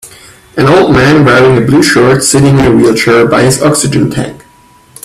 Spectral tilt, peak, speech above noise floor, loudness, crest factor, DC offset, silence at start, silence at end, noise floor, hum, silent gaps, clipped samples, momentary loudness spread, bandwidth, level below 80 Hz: -5 dB/octave; 0 dBFS; 35 dB; -6 LUFS; 8 dB; under 0.1%; 0.05 s; 0.7 s; -41 dBFS; none; none; 0.2%; 6 LU; 15 kHz; -32 dBFS